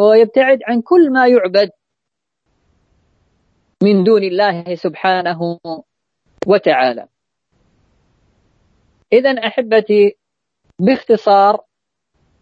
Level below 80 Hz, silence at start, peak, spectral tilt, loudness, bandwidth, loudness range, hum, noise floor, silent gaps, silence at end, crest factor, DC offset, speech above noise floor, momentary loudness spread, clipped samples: -64 dBFS; 0 s; 0 dBFS; -7.5 dB/octave; -13 LUFS; 7.2 kHz; 5 LU; none; -80 dBFS; none; 0.85 s; 14 dB; under 0.1%; 68 dB; 12 LU; under 0.1%